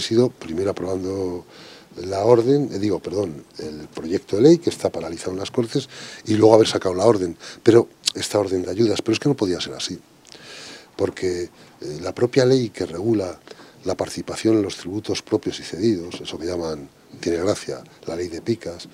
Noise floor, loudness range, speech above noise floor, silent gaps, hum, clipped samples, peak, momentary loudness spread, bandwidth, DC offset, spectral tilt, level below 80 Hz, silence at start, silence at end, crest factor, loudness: -42 dBFS; 7 LU; 21 dB; none; none; under 0.1%; 0 dBFS; 18 LU; 14 kHz; under 0.1%; -5.5 dB/octave; -60 dBFS; 0 s; 0.05 s; 22 dB; -21 LUFS